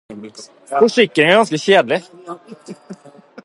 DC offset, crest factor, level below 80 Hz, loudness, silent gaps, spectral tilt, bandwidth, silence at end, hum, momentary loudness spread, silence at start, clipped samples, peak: under 0.1%; 18 dB; -66 dBFS; -14 LUFS; none; -4.5 dB/octave; 11.5 kHz; 0.5 s; none; 24 LU; 0.1 s; under 0.1%; 0 dBFS